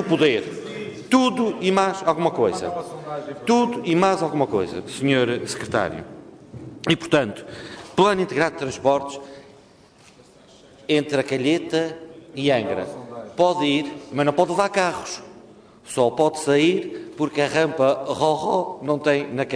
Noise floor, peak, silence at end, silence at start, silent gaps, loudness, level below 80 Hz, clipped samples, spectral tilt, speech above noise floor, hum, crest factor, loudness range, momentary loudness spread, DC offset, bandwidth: -51 dBFS; -4 dBFS; 0 s; 0 s; none; -22 LUFS; -60 dBFS; under 0.1%; -5 dB/octave; 30 dB; none; 18 dB; 3 LU; 15 LU; under 0.1%; 11 kHz